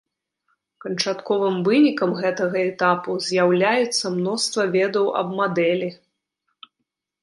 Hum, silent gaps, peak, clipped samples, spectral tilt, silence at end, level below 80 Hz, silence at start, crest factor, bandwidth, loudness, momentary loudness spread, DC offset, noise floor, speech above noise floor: none; none; -4 dBFS; under 0.1%; -4.5 dB/octave; 1.25 s; -72 dBFS; 0.85 s; 18 dB; 11.5 kHz; -21 LUFS; 7 LU; under 0.1%; -79 dBFS; 59 dB